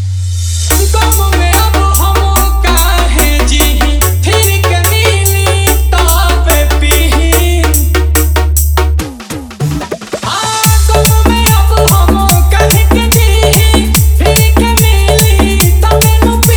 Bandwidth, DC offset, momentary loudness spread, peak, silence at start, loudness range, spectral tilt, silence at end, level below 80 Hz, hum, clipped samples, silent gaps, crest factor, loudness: over 20 kHz; under 0.1%; 6 LU; 0 dBFS; 0 s; 3 LU; -4 dB/octave; 0 s; -10 dBFS; none; 0.5%; none; 8 dB; -9 LUFS